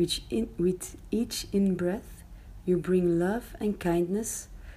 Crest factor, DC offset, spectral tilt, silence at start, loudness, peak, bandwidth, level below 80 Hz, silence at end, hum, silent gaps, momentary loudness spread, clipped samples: 14 dB; under 0.1%; -5.5 dB/octave; 0 s; -29 LUFS; -14 dBFS; 15.5 kHz; -48 dBFS; 0 s; none; none; 12 LU; under 0.1%